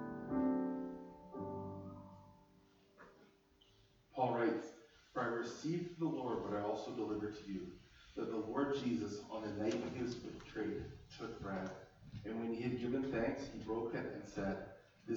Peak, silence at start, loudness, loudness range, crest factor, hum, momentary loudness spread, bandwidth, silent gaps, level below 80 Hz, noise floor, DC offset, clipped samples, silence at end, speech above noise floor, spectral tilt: -24 dBFS; 0 s; -42 LUFS; 4 LU; 20 dB; none; 16 LU; over 20 kHz; none; -66 dBFS; -70 dBFS; under 0.1%; under 0.1%; 0 s; 28 dB; -6.5 dB/octave